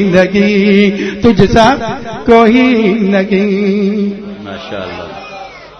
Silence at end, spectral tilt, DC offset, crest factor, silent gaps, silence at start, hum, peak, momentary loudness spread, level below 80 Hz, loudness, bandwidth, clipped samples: 0.15 s; -6.5 dB/octave; under 0.1%; 10 dB; none; 0 s; none; 0 dBFS; 17 LU; -34 dBFS; -10 LUFS; 6.8 kHz; 0.9%